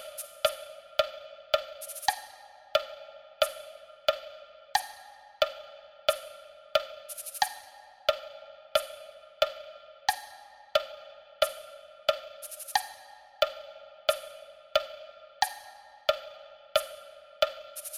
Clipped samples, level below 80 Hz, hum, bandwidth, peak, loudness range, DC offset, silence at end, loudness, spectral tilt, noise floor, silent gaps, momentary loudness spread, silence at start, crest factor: under 0.1%; -66 dBFS; none; 16.5 kHz; -10 dBFS; 1 LU; under 0.1%; 0 s; -32 LUFS; 0.5 dB/octave; -52 dBFS; none; 18 LU; 0 s; 24 dB